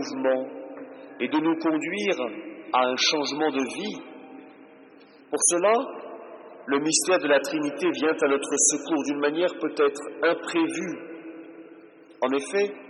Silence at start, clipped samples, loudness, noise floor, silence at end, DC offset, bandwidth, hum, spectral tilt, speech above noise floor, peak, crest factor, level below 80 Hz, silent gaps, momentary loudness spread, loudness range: 0 s; under 0.1%; -24 LUFS; -51 dBFS; 0 s; under 0.1%; 12.5 kHz; none; -2 dB/octave; 26 dB; -6 dBFS; 20 dB; -82 dBFS; none; 20 LU; 4 LU